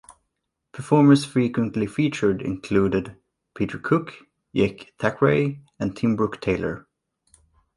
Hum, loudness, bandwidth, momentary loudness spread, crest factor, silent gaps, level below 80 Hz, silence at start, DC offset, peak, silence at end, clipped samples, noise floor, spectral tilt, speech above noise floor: none; -23 LUFS; 11.5 kHz; 12 LU; 20 dB; none; -52 dBFS; 0.1 s; under 0.1%; -4 dBFS; 0.95 s; under 0.1%; -79 dBFS; -7 dB/octave; 57 dB